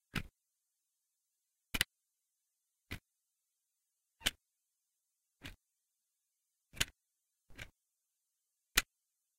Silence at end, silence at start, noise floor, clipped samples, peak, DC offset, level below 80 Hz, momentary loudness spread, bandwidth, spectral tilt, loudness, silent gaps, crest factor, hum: 0.55 s; 0.15 s; -87 dBFS; under 0.1%; -10 dBFS; under 0.1%; -58 dBFS; 20 LU; 16 kHz; -1 dB/octave; -38 LUFS; none; 36 dB; none